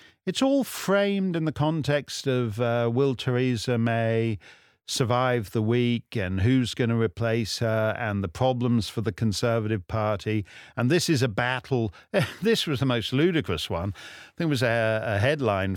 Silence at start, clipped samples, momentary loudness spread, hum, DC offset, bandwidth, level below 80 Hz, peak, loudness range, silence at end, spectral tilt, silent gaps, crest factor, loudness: 0.25 s; under 0.1%; 6 LU; none; under 0.1%; 18.5 kHz; -54 dBFS; -8 dBFS; 1 LU; 0 s; -6 dB/octave; none; 18 dB; -25 LUFS